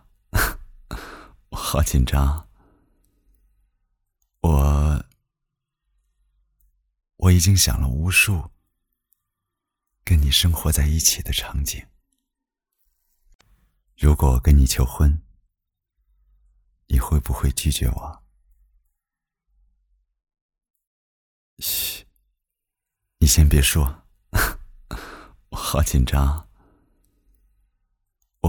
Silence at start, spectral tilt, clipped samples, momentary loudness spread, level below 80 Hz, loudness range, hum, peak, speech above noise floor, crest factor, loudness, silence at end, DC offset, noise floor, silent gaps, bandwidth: 0.35 s; -4 dB/octave; under 0.1%; 20 LU; -28 dBFS; 7 LU; none; -2 dBFS; 67 dB; 20 dB; -20 LUFS; 0 s; under 0.1%; -86 dBFS; 13.35-13.39 s, 20.41-20.49 s, 20.70-20.74 s, 20.87-21.57 s; over 20 kHz